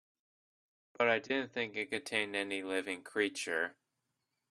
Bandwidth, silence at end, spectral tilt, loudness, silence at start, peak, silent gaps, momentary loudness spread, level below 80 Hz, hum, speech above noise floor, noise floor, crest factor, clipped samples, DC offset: 12.5 kHz; 0.8 s; -3 dB/octave; -35 LUFS; 1 s; -14 dBFS; none; 6 LU; -80 dBFS; none; 50 dB; -85 dBFS; 24 dB; under 0.1%; under 0.1%